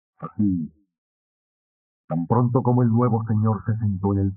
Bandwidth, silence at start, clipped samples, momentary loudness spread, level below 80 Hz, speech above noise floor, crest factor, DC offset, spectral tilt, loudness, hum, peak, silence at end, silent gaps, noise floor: 2.4 kHz; 0.2 s; under 0.1%; 10 LU; -60 dBFS; over 69 dB; 18 dB; under 0.1%; -14 dB/octave; -22 LUFS; none; -4 dBFS; 0 s; 0.98-2.08 s; under -90 dBFS